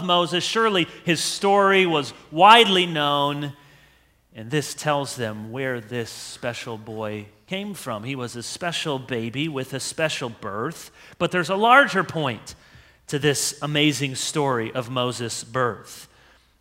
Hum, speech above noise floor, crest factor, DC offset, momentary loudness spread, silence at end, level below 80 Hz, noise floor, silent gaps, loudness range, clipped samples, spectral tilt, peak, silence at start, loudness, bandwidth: none; 35 dB; 24 dB; under 0.1%; 16 LU; 0.55 s; -62 dBFS; -58 dBFS; none; 11 LU; under 0.1%; -3.5 dB/octave; 0 dBFS; 0 s; -22 LUFS; 16 kHz